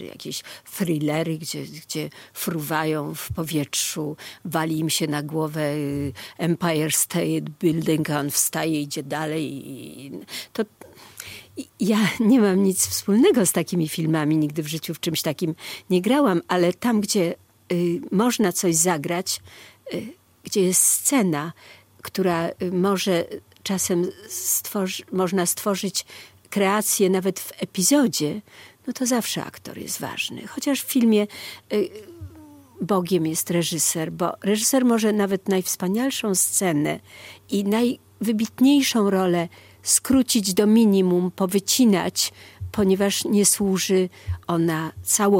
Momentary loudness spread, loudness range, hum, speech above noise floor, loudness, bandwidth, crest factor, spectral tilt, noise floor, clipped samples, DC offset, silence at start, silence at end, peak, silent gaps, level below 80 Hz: 15 LU; 6 LU; none; 24 dB; -22 LUFS; 17 kHz; 18 dB; -4 dB/octave; -46 dBFS; under 0.1%; under 0.1%; 0 s; 0 s; -4 dBFS; none; -56 dBFS